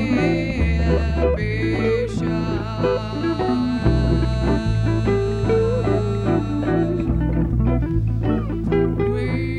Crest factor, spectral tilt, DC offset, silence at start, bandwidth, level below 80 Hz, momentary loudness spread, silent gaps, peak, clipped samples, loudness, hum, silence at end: 14 dB; -8.5 dB/octave; under 0.1%; 0 s; 9.4 kHz; -26 dBFS; 3 LU; none; -4 dBFS; under 0.1%; -21 LUFS; none; 0 s